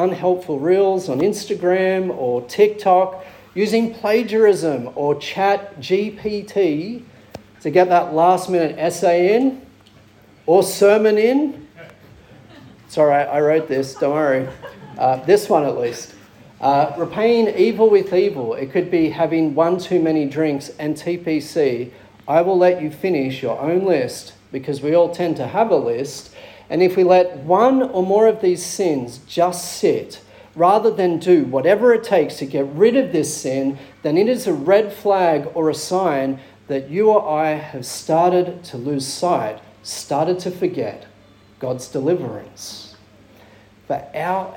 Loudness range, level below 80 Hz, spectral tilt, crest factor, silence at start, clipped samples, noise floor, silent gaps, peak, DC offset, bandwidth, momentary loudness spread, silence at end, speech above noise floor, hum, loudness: 4 LU; -60 dBFS; -5.5 dB/octave; 16 dB; 0 s; under 0.1%; -49 dBFS; none; -2 dBFS; under 0.1%; 17.5 kHz; 13 LU; 0 s; 31 dB; none; -18 LUFS